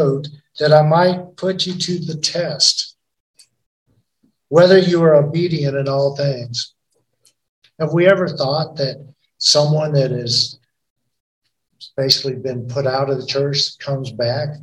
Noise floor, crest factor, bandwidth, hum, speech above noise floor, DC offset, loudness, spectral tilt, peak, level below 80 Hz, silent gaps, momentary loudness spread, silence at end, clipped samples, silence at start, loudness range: -64 dBFS; 18 dB; 15.5 kHz; none; 48 dB; under 0.1%; -16 LUFS; -4.5 dB/octave; 0 dBFS; -60 dBFS; 3.20-3.34 s, 3.66-3.86 s, 7.49-7.62 s, 10.90-10.96 s, 11.20-11.42 s; 12 LU; 0 s; under 0.1%; 0 s; 4 LU